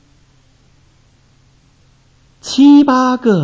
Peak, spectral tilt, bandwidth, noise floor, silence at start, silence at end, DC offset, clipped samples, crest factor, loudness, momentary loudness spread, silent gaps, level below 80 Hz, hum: -2 dBFS; -6 dB/octave; 8 kHz; -51 dBFS; 2.45 s; 0 s; under 0.1%; under 0.1%; 14 dB; -10 LUFS; 14 LU; none; -54 dBFS; none